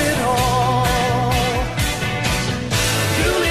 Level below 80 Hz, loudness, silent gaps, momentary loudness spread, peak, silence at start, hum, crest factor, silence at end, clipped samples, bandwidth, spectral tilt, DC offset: -30 dBFS; -18 LUFS; none; 3 LU; -4 dBFS; 0 s; none; 14 dB; 0 s; under 0.1%; 15 kHz; -4 dB/octave; 0.7%